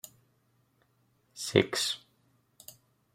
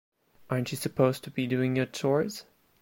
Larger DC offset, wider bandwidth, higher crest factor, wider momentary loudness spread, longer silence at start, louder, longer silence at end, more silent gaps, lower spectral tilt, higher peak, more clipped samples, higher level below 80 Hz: neither; about the same, 16 kHz vs 16.5 kHz; first, 30 dB vs 20 dB; first, 25 LU vs 7 LU; first, 1.35 s vs 0.5 s; about the same, -30 LUFS vs -29 LUFS; first, 1.2 s vs 0.4 s; neither; second, -3.5 dB/octave vs -6 dB/octave; first, -6 dBFS vs -10 dBFS; neither; second, -72 dBFS vs -66 dBFS